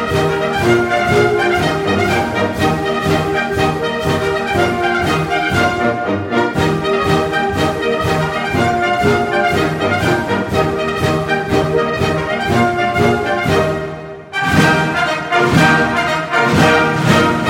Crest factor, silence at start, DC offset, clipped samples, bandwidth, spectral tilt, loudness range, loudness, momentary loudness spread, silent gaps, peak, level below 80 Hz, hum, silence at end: 14 dB; 0 s; under 0.1%; under 0.1%; 16.5 kHz; -5.5 dB/octave; 2 LU; -15 LUFS; 5 LU; none; 0 dBFS; -38 dBFS; none; 0 s